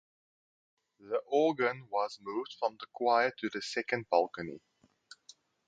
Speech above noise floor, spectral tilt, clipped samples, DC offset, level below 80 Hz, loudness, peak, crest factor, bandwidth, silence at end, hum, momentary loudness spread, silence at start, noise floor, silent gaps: 29 dB; -4.5 dB/octave; under 0.1%; under 0.1%; -78 dBFS; -33 LUFS; -12 dBFS; 22 dB; 9.2 kHz; 1.1 s; none; 11 LU; 1.05 s; -61 dBFS; none